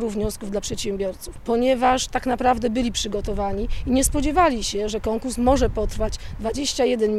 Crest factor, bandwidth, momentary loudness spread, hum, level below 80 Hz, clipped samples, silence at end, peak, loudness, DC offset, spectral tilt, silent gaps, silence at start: 16 dB; 15.5 kHz; 9 LU; none; -32 dBFS; under 0.1%; 0 s; -6 dBFS; -23 LUFS; under 0.1%; -4 dB/octave; none; 0 s